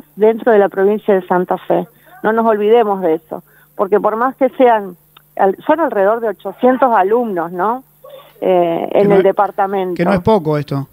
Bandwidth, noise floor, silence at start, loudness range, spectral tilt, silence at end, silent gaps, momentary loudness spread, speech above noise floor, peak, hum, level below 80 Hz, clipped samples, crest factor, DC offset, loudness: 16 kHz; -39 dBFS; 0.15 s; 1 LU; -8.5 dB/octave; 0.05 s; none; 9 LU; 25 dB; 0 dBFS; none; -52 dBFS; under 0.1%; 14 dB; under 0.1%; -14 LUFS